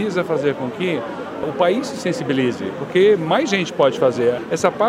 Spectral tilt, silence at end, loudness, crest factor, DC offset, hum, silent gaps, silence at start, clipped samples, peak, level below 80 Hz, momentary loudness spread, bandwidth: -5.5 dB/octave; 0 s; -19 LUFS; 16 dB; under 0.1%; none; none; 0 s; under 0.1%; -2 dBFS; -60 dBFS; 9 LU; 13.5 kHz